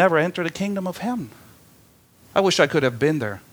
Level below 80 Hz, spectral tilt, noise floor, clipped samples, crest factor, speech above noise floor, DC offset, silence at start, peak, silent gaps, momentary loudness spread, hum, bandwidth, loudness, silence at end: -60 dBFS; -5 dB/octave; -54 dBFS; under 0.1%; 22 dB; 33 dB; under 0.1%; 0 s; -2 dBFS; none; 10 LU; none; over 20 kHz; -22 LUFS; 0.15 s